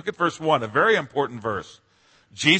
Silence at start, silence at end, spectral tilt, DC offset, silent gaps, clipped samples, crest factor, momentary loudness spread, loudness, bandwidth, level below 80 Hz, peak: 0.05 s; 0 s; -4 dB/octave; under 0.1%; none; under 0.1%; 22 dB; 10 LU; -23 LUFS; 8.8 kHz; -64 dBFS; -2 dBFS